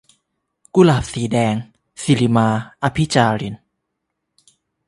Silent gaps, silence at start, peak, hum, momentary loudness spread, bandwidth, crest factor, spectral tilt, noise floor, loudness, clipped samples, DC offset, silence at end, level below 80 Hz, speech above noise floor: none; 0.75 s; 0 dBFS; none; 13 LU; 11.5 kHz; 18 dB; -6 dB/octave; -76 dBFS; -18 LUFS; under 0.1%; under 0.1%; 1.3 s; -46 dBFS; 60 dB